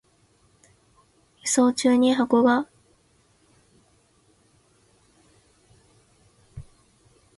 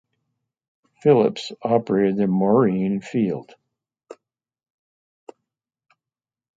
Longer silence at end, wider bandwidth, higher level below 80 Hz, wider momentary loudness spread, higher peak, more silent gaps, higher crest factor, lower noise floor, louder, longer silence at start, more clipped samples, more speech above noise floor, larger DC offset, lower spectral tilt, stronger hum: second, 0.75 s vs 2.45 s; first, 11.5 kHz vs 7.8 kHz; about the same, -62 dBFS vs -66 dBFS; first, 27 LU vs 7 LU; second, -8 dBFS vs -4 dBFS; neither; about the same, 20 dB vs 20 dB; second, -62 dBFS vs under -90 dBFS; about the same, -21 LUFS vs -20 LUFS; first, 1.45 s vs 1.05 s; neither; second, 43 dB vs over 70 dB; neither; second, -3.5 dB/octave vs -8 dB/octave; neither